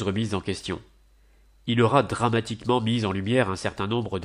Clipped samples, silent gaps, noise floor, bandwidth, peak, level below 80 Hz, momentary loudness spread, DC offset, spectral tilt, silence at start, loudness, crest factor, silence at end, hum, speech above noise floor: under 0.1%; none; -57 dBFS; 11 kHz; -6 dBFS; -54 dBFS; 11 LU; under 0.1%; -6 dB/octave; 0 s; -25 LUFS; 20 dB; 0 s; none; 33 dB